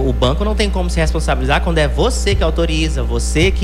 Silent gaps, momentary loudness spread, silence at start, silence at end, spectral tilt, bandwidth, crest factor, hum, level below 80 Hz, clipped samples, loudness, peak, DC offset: none; 3 LU; 0 s; 0 s; -5 dB/octave; 12 kHz; 10 dB; none; -18 dBFS; under 0.1%; -16 LUFS; -4 dBFS; under 0.1%